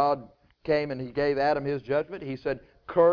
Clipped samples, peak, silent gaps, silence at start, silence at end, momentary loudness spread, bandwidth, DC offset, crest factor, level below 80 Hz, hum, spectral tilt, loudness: under 0.1%; -10 dBFS; none; 0 s; 0 s; 9 LU; 5.4 kHz; under 0.1%; 16 dB; -56 dBFS; none; -8 dB/octave; -28 LUFS